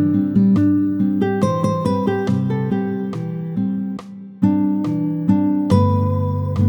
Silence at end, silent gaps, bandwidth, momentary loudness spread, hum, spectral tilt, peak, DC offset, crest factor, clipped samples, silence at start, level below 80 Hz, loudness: 0 s; none; 18.5 kHz; 9 LU; none; -9 dB/octave; -2 dBFS; under 0.1%; 16 dB; under 0.1%; 0 s; -52 dBFS; -19 LUFS